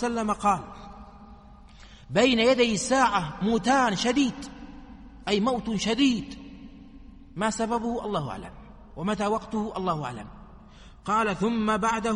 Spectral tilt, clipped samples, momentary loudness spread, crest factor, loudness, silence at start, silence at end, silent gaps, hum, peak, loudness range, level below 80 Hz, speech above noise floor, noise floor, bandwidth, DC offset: -4.5 dB/octave; under 0.1%; 22 LU; 20 dB; -25 LUFS; 0 s; 0 s; none; none; -8 dBFS; 7 LU; -50 dBFS; 23 dB; -49 dBFS; 11.5 kHz; under 0.1%